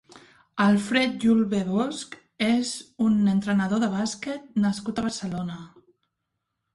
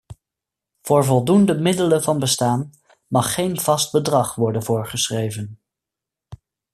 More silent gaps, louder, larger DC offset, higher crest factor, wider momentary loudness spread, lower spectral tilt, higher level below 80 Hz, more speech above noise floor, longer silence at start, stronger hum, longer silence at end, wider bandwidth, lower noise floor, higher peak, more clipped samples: neither; second, -25 LUFS vs -19 LUFS; neither; about the same, 18 dB vs 18 dB; about the same, 12 LU vs 10 LU; about the same, -5.5 dB/octave vs -5 dB/octave; about the same, -60 dBFS vs -56 dBFS; second, 57 dB vs 67 dB; about the same, 0.15 s vs 0.1 s; neither; first, 1.1 s vs 0.4 s; second, 11.5 kHz vs 14.5 kHz; second, -81 dBFS vs -86 dBFS; second, -8 dBFS vs -2 dBFS; neither